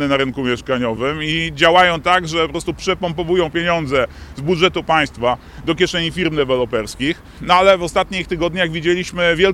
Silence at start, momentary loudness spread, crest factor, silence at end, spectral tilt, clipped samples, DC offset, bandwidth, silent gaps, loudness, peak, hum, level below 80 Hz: 0 s; 9 LU; 16 dB; 0 s; -4.5 dB/octave; under 0.1%; under 0.1%; 13.5 kHz; none; -17 LUFS; 0 dBFS; none; -38 dBFS